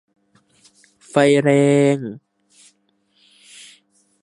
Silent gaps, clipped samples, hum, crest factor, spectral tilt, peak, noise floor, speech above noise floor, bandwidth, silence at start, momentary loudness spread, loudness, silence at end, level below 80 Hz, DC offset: none; under 0.1%; none; 20 dB; -6.5 dB/octave; -2 dBFS; -64 dBFS; 49 dB; 11.5 kHz; 1.15 s; 16 LU; -16 LUFS; 2.05 s; -68 dBFS; under 0.1%